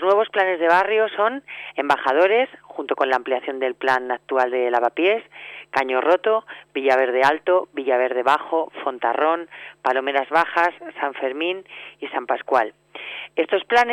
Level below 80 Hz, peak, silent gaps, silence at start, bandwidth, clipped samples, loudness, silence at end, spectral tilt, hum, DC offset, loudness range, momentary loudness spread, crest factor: -68 dBFS; -6 dBFS; none; 0 s; 13 kHz; under 0.1%; -21 LUFS; 0 s; -4 dB/octave; none; under 0.1%; 3 LU; 12 LU; 16 dB